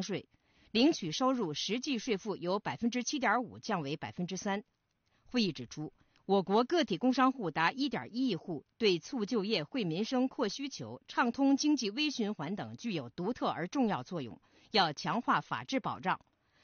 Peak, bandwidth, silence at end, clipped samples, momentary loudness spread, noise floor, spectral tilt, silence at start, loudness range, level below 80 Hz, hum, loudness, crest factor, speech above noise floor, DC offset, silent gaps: -14 dBFS; 6.8 kHz; 0.45 s; under 0.1%; 10 LU; -73 dBFS; -3.5 dB/octave; 0 s; 3 LU; -72 dBFS; none; -33 LUFS; 18 dB; 40 dB; under 0.1%; none